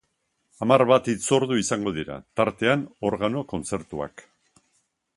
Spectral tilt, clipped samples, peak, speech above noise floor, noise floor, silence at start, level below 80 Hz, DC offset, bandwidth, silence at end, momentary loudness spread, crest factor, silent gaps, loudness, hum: -5 dB/octave; under 0.1%; -2 dBFS; 50 dB; -74 dBFS; 0.6 s; -56 dBFS; under 0.1%; 11.5 kHz; 0.95 s; 13 LU; 22 dB; none; -24 LUFS; none